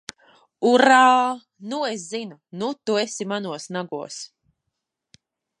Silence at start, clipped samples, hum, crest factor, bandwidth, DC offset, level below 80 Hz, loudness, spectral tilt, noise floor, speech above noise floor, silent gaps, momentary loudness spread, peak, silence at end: 0.6 s; under 0.1%; none; 20 dB; 11.5 kHz; under 0.1%; -78 dBFS; -21 LUFS; -3.5 dB/octave; -81 dBFS; 59 dB; none; 20 LU; -2 dBFS; 1.35 s